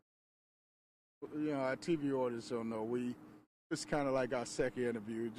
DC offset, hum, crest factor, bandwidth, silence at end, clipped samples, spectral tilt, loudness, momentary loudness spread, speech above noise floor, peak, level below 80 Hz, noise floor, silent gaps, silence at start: under 0.1%; none; 16 dB; 14.5 kHz; 0 s; under 0.1%; -5.5 dB/octave; -38 LUFS; 9 LU; over 53 dB; -22 dBFS; -66 dBFS; under -90 dBFS; 3.46-3.70 s; 1.2 s